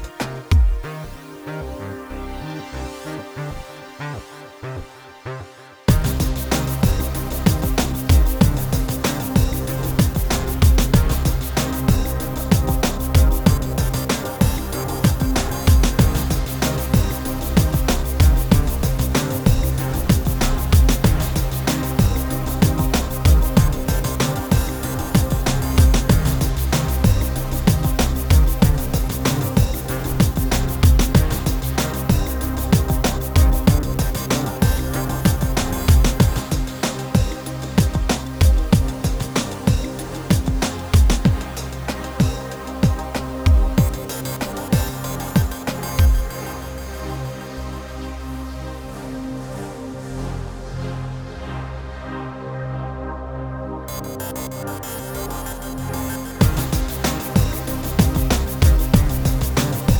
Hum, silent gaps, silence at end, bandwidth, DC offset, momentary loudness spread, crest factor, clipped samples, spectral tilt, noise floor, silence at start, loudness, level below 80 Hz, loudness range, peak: none; none; 0 s; over 20 kHz; under 0.1%; 14 LU; 18 dB; under 0.1%; -5.5 dB/octave; -39 dBFS; 0 s; -20 LUFS; -22 dBFS; 11 LU; 0 dBFS